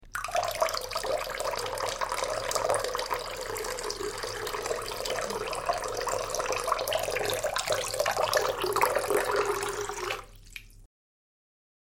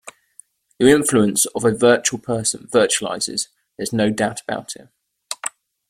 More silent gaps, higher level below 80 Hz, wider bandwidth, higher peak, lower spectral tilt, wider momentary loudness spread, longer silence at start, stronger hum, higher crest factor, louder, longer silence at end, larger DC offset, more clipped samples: neither; about the same, -52 dBFS vs -56 dBFS; about the same, 17 kHz vs 16.5 kHz; second, -8 dBFS vs -2 dBFS; second, -2 dB/octave vs -3.5 dB/octave; second, 7 LU vs 15 LU; about the same, 0 s vs 0.05 s; neither; first, 24 dB vs 18 dB; second, -30 LUFS vs -19 LUFS; first, 0.95 s vs 0.4 s; neither; neither